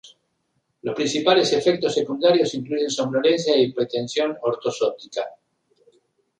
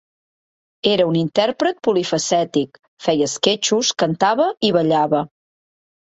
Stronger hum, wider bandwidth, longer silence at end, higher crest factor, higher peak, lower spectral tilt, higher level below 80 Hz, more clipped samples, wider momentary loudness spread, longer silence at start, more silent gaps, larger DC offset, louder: neither; first, 10 kHz vs 8.2 kHz; first, 1.05 s vs 0.75 s; about the same, 20 dB vs 18 dB; second, -4 dBFS vs 0 dBFS; about the same, -4 dB/octave vs -4 dB/octave; about the same, -66 dBFS vs -62 dBFS; neither; first, 12 LU vs 6 LU; second, 0.05 s vs 0.85 s; second, none vs 2.88-2.97 s; neither; second, -21 LUFS vs -18 LUFS